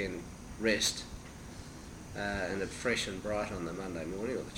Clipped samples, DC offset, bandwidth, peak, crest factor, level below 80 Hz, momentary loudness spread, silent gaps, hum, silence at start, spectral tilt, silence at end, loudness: under 0.1%; under 0.1%; 19.5 kHz; -16 dBFS; 20 dB; -52 dBFS; 17 LU; none; none; 0 s; -3.5 dB/octave; 0 s; -35 LUFS